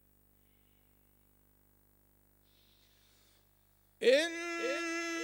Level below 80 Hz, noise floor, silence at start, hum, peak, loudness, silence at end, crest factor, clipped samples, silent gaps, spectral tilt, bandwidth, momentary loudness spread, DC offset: -74 dBFS; -69 dBFS; 4 s; 50 Hz at -70 dBFS; -16 dBFS; -32 LUFS; 0 s; 22 dB; under 0.1%; none; -1.5 dB/octave; 17 kHz; 8 LU; under 0.1%